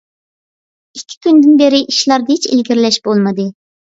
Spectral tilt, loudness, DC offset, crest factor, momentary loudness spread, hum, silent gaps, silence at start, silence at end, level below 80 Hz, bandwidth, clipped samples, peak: -4.5 dB/octave; -11 LUFS; under 0.1%; 12 dB; 16 LU; none; 1.17-1.21 s; 0.95 s; 0.45 s; -62 dBFS; 7.8 kHz; under 0.1%; 0 dBFS